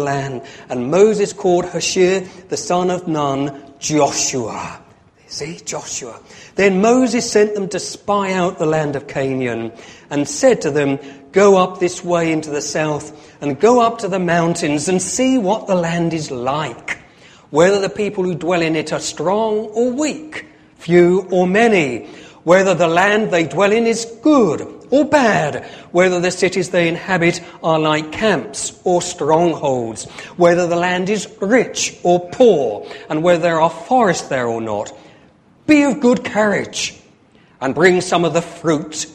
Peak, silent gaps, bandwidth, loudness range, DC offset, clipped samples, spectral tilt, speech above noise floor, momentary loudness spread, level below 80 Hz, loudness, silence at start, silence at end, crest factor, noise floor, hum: 0 dBFS; none; 13 kHz; 4 LU; under 0.1%; under 0.1%; -4.5 dB/octave; 34 dB; 13 LU; -54 dBFS; -16 LUFS; 0 s; 0.05 s; 16 dB; -50 dBFS; none